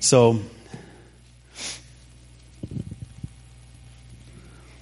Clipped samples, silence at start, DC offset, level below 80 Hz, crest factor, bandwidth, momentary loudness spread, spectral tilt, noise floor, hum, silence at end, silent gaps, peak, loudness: under 0.1%; 0 s; under 0.1%; -50 dBFS; 24 dB; 11.5 kHz; 29 LU; -4.5 dB/octave; -51 dBFS; none; 0.65 s; none; -2 dBFS; -24 LUFS